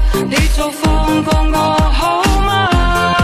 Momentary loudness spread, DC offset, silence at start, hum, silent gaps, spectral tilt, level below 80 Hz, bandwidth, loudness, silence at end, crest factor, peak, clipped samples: 2 LU; under 0.1%; 0 s; none; none; -5 dB/octave; -16 dBFS; 16 kHz; -14 LUFS; 0 s; 12 dB; 0 dBFS; under 0.1%